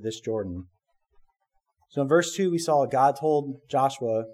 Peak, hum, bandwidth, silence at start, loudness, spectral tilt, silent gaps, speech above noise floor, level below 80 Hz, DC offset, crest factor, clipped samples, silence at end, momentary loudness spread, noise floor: -8 dBFS; none; 15 kHz; 0 s; -25 LUFS; -5.5 dB/octave; none; 49 dB; -64 dBFS; under 0.1%; 18 dB; under 0.1%; 0 s; 10 LU; -74 dBFS